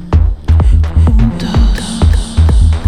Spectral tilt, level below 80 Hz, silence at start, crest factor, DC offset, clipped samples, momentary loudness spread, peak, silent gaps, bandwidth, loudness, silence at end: -7 dB/octave; -10 dBFS; 0 s; 8 dB; under 0.1%; under 0.1%; 3 LU; 0 dBFS; none; 10.5 kHz; -12 LUFS; 0 s